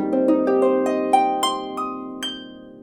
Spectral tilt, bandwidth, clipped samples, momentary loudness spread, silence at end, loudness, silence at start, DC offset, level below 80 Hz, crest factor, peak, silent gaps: -4 dB/octave; 18 kHz; under 0.1%; 11 LU; 0 s; -21 LUFS; 0 s; under 0.1%; -62 dBFS; 16 dB; -4 dBFS; none